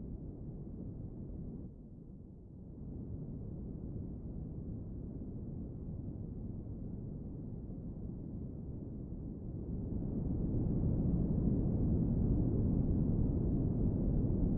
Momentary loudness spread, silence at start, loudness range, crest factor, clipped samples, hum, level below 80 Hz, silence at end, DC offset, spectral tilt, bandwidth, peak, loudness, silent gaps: 13 LU; 0 s; 13 LU; 16 dB; under 0.1%; none; -44 dBFS; 0 s; under 0.1%; -14.5 dB/octave; 1.9 kHz; -20 dBFS; -39 LUFS; none